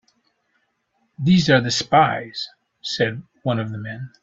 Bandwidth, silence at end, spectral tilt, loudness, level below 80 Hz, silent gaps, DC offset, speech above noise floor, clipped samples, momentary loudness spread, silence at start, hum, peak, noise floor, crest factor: 7.8 kHz; 0.15 s; -5 dB/octave; -20 LUFS; -56 dBFS; none; under 0.1%; 49 dB; under 0.1%; 15 LU; 1.2 s; none; -2 dBFS; -69 dBFS; 20 dB